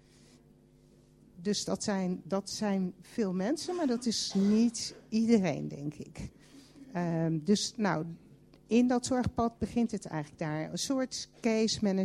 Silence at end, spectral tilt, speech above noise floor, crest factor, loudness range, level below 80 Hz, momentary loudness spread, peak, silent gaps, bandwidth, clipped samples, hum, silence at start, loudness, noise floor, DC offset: 0 s; -5 dB/octave; 30 dB; 20 dB; 4 LU; -60 dBFS; 12 LU; -12 dBFS; none; 13 kHz; under 0.1%; none; 1.35 s; -31 LUFS; -61 dBFS; under 0.1%